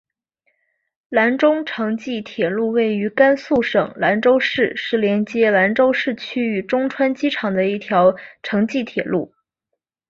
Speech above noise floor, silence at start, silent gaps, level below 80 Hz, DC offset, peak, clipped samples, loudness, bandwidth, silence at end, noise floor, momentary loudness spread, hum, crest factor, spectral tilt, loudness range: 61 dB; 1.1 s; none; -60 dBFS; under 0.1%; -2 dBFS; under 0.1%; -18 LUFS; 7.4 kHz; 0.85 s; -79 dBFS; 8 LU; none; 16 dB; -6.5 dB/octave; 3 LU